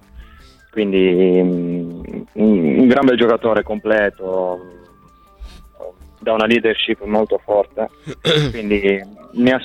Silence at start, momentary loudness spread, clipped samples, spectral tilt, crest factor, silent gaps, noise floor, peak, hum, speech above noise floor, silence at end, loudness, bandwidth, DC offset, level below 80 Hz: 0.15 s; 16 LU; under 0.1%; -6.5 dB/octave; 14 dB; none; -48 dBFS; -2 dBFS; none; 32 dB; 0 s; -16 LUFS; 11 kHz; under 0.1%; -44 dBFS